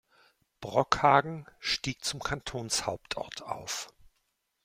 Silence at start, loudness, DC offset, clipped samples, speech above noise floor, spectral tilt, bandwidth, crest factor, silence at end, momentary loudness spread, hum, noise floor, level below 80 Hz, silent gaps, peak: 0.6 s; -30 LUFS; under 0.1%; under 0.1%; 47 dB; -3 dB/octave; 16.5 kHz; 26 dB; 0.8 s; 14 LU; none; -78 dBFS; -56 dBFS; none; -6 dBFS